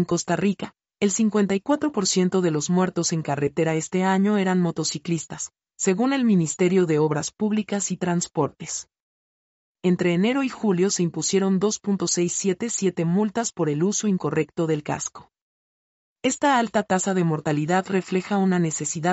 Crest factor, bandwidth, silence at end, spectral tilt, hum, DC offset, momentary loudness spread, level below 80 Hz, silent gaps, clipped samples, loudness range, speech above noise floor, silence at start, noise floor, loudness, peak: 14 dB; 8.2 kHz; 0 s; -5 dB/octave; none; under 0.1%; 6 LU; -64 dBFS; 9.00-9.75 s, 15.41-16.16 s; under 0.1%; 3 LU; over 68 dB; 0 s; under -90 dBFS; -23 LUFS; -8 dBFS